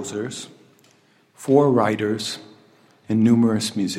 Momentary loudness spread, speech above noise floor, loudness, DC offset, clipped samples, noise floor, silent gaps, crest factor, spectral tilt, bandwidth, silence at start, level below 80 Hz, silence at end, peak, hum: 18 LU; 38 dB; -20 LUFS; under 0.1%; under 0.1%; -58 dBFS; none; 18 dB; -5.5 dB/octave; 14.5 kHz; 0 s; -70 dBFS; 0 s; -4 dBFS; none